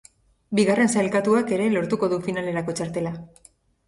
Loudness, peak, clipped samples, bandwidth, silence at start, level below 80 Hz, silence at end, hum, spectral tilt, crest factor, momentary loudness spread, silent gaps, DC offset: -23 LUFS; -6 dBFS; under 0.1%; 11.5 kHz; 0.5 s; -60 dBFS; 0.6 s; none; -5.5 dB/octave; 16 dB; 9 LU; none; under 0.1%